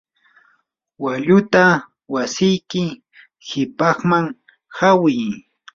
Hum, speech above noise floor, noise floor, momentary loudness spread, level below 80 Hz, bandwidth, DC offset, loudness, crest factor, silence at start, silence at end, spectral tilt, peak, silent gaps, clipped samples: none; 48 dB; -64 dBFS; 14 LU; -58 dBFS; 7.6 kHz; under 0.1%; -18 LUFS; 18 dB; 1 s; 0.35 s; -5.5 dB/octave; -2 dBFS; none; under 0.1%